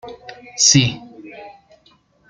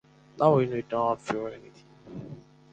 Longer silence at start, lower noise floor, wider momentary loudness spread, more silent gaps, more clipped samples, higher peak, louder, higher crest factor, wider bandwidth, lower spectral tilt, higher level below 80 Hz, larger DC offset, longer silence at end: second, 0.05 s vs 0.35 s; first, -56 dBFS vs -46 dBFS; first, 26 LU vs 23 LU; neither; neither; first, 0 dBFS vs -6 dBFS; first, -13 LUFS vs -27 LUFS; about the same, 20 dB vs 22 dB; first, 11 kHz vs 9 kHz; second, -2.5 dB/octave vs -7.5 dB/octave; first, -52 dBFS vs -64 dBFS; neither; first, 0.8 s vs 0.35 s